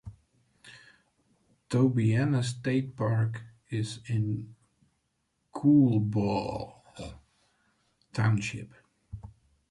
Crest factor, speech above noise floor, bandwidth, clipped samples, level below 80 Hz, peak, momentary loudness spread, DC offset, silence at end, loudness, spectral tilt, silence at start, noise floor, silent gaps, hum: 18 dB; 50 dB; 11 kHz; under 0.1%; -58 dBFS; -12 dBFS; 23 LU; under 0.1%; 0.4 s; -28 LUFS; -7.5 dB/octave; 0.05 s; -77 dBFS; none; none